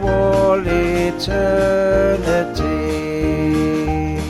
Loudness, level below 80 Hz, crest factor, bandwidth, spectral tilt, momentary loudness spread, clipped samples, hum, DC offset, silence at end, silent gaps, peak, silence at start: -17 LUFS; -28 dBFS; 12 dB; 14.5 kHz; -6.5 dB/octave; 5 LU; under 0.1%; none; under 0.1%; 0 s; none; -4 dBFS; 0 s